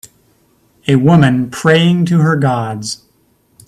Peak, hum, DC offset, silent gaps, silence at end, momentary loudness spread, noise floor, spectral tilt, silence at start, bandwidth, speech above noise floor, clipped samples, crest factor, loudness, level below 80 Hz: 0 dBFS; none; under 0.1%; none; 0.7 s; 14 LU; -56 dBFS; -6.5 dB/octave; 0.85 s; 13 kHz; 44 dB; under 0.1%; 14 dB; -12 LUFS; -48 dBFS